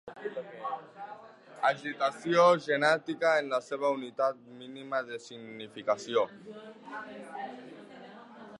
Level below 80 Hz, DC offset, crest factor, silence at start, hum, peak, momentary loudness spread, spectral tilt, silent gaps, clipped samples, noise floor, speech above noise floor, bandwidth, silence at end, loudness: -84 dBFS; under 0.1%; 20 dB; 0.05 s; none; -10 dBFS; 21 LU; -4.5 dB/octave; none; under 0.1%; -50 dBFS; 20 dB; 11 kHz; 0 s; -30 LUFS